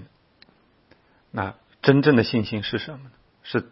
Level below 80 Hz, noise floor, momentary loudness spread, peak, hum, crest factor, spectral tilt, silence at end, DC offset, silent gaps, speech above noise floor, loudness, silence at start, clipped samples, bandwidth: -58 dBFS; -59 dBFS; 19 LU; -2 dBFS; none; 24 dB; -10.5 dB/octave; 0.1 s; under 0.1%; none; 37 dB; -22 LUFS; 0 s; under 0.1%; 5.8 kHz